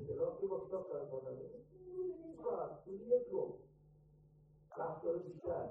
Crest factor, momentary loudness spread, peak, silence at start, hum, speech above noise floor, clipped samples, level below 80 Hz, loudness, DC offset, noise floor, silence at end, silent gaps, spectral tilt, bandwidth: 20 dB; 14 LU; -24 dBFS; 0 s; none; 25 dB; under 0.1%; -72 dBFS; -43 LUFS; under 0.1%; -66 dBFS; 0 s; none; -10.5 dB/octave; 1.8 kHz